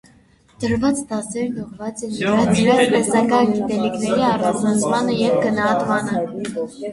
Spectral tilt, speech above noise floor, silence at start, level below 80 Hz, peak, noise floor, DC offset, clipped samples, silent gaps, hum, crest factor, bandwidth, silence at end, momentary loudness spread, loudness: -5 dB/octave; 34 dB; 0.6 s; -50 dBFS; -2 dBFS; -53 dBFS; under 0.1%; under 0.1%; none; none; 16 dB; 11.5 kHz; 0 s; 11 LU; -19 LUFS